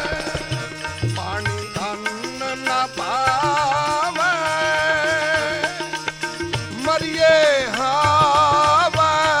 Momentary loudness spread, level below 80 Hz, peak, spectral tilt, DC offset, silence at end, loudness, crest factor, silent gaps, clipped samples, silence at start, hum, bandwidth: 11 LU; -46 dBFS; -4 dBFS; -3.5 dB/octave; under 0.1%; 0 s; -19 LUFS; 14 dB; none; under 0.1%; 0 s; none; 16 kHz